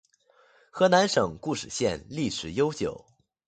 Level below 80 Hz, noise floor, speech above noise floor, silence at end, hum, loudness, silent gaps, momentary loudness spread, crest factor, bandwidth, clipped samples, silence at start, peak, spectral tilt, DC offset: -56 dBFS; -62 dBFS; 36 dB; 0.5 s; none; -26 LUFS; none; 12 LU; 20 dB; 9.4 kHz; under 0.1%; 0.75 s; -8 dBFS; -4.5 dB/octave; under 0.1%